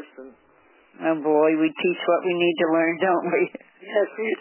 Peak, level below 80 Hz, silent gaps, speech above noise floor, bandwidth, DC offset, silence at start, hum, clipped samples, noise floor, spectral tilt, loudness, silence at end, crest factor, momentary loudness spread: -8 dBFS; -80 dBFS; none; 36 dB; 3.2 kHz; under 0.1%; 0 s; none; under 0.1%; -57 dBFS; -9.5 dB/octave; -22 LUFS; 0 s; 14 dB; 8 LU